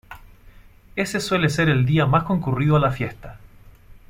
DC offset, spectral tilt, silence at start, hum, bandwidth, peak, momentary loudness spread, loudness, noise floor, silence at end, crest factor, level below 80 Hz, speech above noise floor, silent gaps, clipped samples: under 0.1%; -6.5 dB/octave; 0.1 s; none; 16 kHz; -6 dBFS; 11 LU; -21 LUFS; -47 dBFS; 0.15 s; 16 dB; -44 dBFS; 27 dB; none; under 0.1%